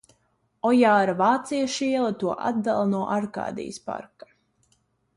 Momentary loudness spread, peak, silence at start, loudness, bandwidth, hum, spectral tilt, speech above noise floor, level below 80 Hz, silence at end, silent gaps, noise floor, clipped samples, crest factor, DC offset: 14 LU; -8 dBFS; 0.65 s; -24 LUFS; 11.5 kHz; none; -5.5 dB/octave; 46 dB; -66 dBFS; 1.1 s; none; -69 dBFS; under 0.1%; 18 dB; under 0.1%